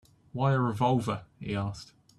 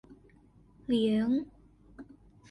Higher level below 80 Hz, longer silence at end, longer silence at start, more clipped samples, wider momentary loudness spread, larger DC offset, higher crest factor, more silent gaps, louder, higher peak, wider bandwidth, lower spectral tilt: about the same, -60 dBFS vs -62 dBFS; about the same, 0.35 s vs 0.45 s; first, 0.35 s vs 0.1 s; neither; second, 12 LU vs 25 LU; neither; about the same, 18 dB vs 16 dB; neither; about the same, -30 LUFS vs -30 LUFS; first, -12 dBFS vs -18 dBFS; about the same, 12 kHz vs 11 kHz; about the same, -7.5 dB/octave vs -7 dB/octave